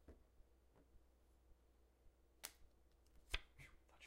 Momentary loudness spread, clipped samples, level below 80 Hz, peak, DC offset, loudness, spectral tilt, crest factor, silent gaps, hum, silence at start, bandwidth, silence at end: 15 LU; under 0.1%; -64 dBFS; -22 dBFS; under 0.1%; -53 LUFS; -1.5 dB/octave; 38 dB; none; none; 0 s; 15.5 kHz; 0 s